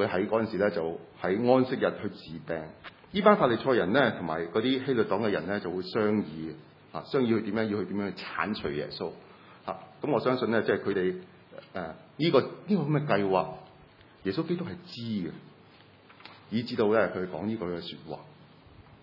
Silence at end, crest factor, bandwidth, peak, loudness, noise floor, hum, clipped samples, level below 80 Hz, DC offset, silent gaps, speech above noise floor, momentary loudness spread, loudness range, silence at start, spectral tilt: 0.2 s; 24 dB; 5.8 kHz; -4 dBFS; -29 LUFS; -56 dBFS; none; under 0.1%; -66 dBFS; under 0.1%; none; 27 dB; 17 LU; 6 LU; 0 s; -8.5 dB/octave